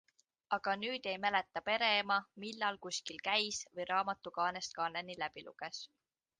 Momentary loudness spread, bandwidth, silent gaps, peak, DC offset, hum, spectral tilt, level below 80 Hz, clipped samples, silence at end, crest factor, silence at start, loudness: 13 LU; 10 kHz; none; -18 dBFS; under 0.1%; none; -1.5 dB/octave; -78 dBFS; under 0.1%; 0.55 s; 22 dB; 0.5 s; -37 LUFS